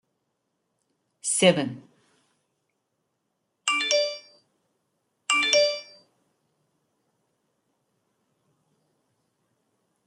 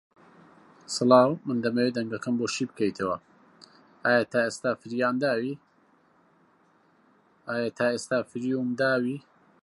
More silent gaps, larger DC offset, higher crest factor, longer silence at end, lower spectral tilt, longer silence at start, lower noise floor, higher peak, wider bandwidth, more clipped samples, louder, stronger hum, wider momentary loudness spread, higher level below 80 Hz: neither; neither; about the same, 26 dB vs 22 dB; first, 4.25 s vs 0.45 s; second, -2.5 dB/octave vs -5 dB/octave; first, 1.25 s vs 0.9 s; first, -78 dBFS vs -63 dBFS; about the same, -4 dBFS vs -6 dBFS; about the same, 11.5 kHz vs 11.5 kHz; neither; first, -23 LUFS vs -27 LUFS; neither; first, 16 LU vs 12 LU; second, -78 dBFS vs -72 dBFS